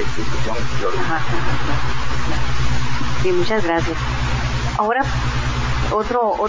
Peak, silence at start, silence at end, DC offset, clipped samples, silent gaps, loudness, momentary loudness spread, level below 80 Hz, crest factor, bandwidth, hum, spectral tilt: -4 dBFS; 0 s; 0 s; 20%; under 0.1%; none; -21 LUFS; 5 LU; -28 dBFS; 14 dB; 7.6 kHz; 60 Hz at -25 dBFS; -5.5 dB/octave